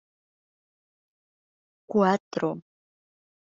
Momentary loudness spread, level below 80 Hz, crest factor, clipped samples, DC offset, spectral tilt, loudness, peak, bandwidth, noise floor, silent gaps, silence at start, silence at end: 9 LU; -74 dBFS; 22 dB; under 0.1%; under 0.1%; -6 dB/octave; -26 LUFS; -8 dBFS; 7.4 kHz; under -90 dBFS; 2.20-2.31 s; 1.9 s; 0.9 s